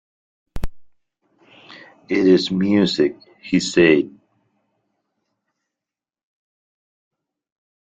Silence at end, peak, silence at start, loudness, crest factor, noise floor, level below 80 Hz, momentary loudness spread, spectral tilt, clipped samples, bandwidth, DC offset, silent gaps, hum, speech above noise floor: 3.75 s; -2 dBFS; 0.55 s; -18 LUFS; 20 dB; -88 dBFS; -42 dBFS; 20 LU; -5.5 dB/octave; under 0.1%; 9.2 kHz; under 0.1%; none; none; 72 dB